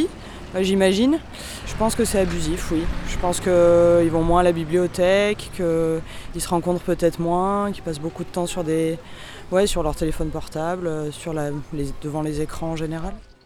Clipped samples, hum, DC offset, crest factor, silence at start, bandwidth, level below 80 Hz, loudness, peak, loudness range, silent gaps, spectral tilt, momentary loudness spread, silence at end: under 0.1%; none; under 0.1%; 18 dB; 0 s; 18.5 kHz; -34 dBFS; -22 LUFS; -4 dBFS; 7 LU; none; -5.5 dB/octave; 12 LU; 0.25 s